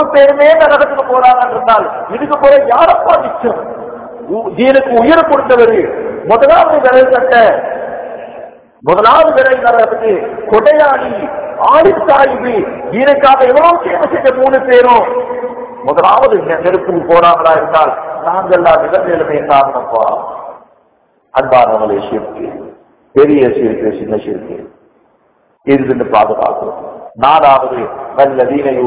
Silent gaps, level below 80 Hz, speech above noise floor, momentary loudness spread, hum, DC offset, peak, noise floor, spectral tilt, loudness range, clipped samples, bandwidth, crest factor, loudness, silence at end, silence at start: none; -44 dBFS; 44 dB; 14 LU; none; under 0.1%; 0 dBFS; -53 dBFS; -9 dB/octave; 6 LU; 4%; 4 kHz; 10 dB; -9 LUFS; 0 s; 0 s